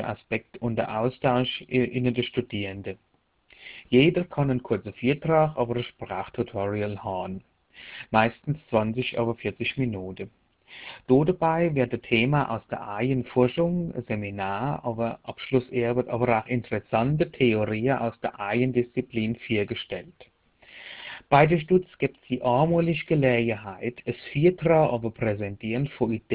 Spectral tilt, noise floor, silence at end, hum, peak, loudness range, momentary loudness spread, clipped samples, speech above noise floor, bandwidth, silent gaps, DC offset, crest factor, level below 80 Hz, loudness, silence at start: -11 dB/octave; -60 dBFS; 0 s; none; -4 dBFS; 4 LU; 13 LU; under 0.1%; 35 dB; 4 kHz; none; under 0.1%; 22 dB; -54 dBFS; -26 LUFS; 0 s